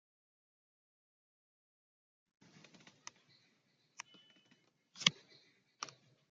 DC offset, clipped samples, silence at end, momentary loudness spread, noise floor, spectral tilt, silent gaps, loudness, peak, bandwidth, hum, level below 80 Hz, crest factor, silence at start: under 0.1%; under 0.1%; 0.45 s; 28 LU; -77 dBFS; 0 dB/octave; none; -37 LUFS; -8 dBFS; 7.4 kHz; none; -90 dBFS; 40 dB; 4.95 s